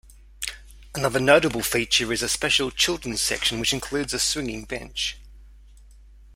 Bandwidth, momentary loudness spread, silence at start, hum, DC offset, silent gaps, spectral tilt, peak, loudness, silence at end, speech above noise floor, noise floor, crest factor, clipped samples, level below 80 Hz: 16.5 kHz; 14 LU; 0.1 s; none; under 0.1%; none; -2.5 dB/octave; 0 dBFS; -23 LUFS; 0.1 s; 25 dB; -48 dBFS; 24 dB; under 0.1%; -46 dBFS